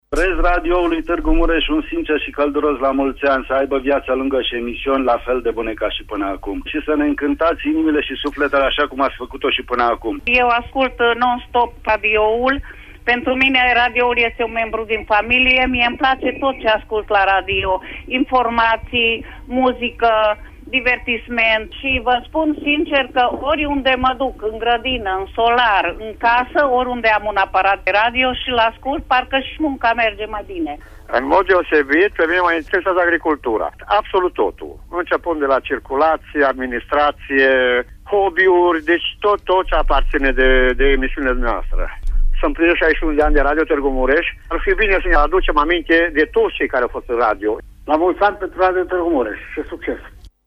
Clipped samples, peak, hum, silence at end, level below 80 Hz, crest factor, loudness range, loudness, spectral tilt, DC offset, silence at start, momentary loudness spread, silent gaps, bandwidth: under 0.1%; -2 dBFS; none; 0.2 s; -28 dBFS; 16 dB; 3 LU; -17 LUFS; -6 dB/octave; under 0.1%; 0.1 s; 8 LU; none; 8.4 kHz